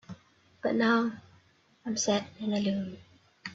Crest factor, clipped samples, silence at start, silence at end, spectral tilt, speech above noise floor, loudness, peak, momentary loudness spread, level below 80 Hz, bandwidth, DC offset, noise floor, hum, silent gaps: 18 dB; under 0.1%; 0.1 s; 0 s; -4 dB/octave; 35 dB; -30 LUFS; -14 dBFS; 24 LU; -70 dBFS; 8 kHz; under 0.1%; -64 dBFS; none; none